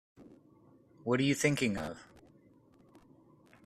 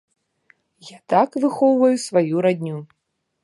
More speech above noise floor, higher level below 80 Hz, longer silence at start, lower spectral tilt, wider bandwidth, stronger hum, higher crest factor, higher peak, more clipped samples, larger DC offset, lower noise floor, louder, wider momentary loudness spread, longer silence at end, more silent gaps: second, 32 dB vs 41 dB; first, -66 dBFS vs -74 dBFS; second, 0.2 s vs 0.85 s; second, -5 dB/octave vs -6.5 dB/octave; first, 14 kHz vs 11.5 kHz; neither; about the same, 22 dB vs 18 dB; second, -14 dBFS vs -4 dBFS; neither; neither; about the same, -63 dBFS vs -60 dBFS; second, -32 LUFS vs -19 LUFS; first, 15 LU vs 11 LU; first, 1.6 s vs 0.6 s; neither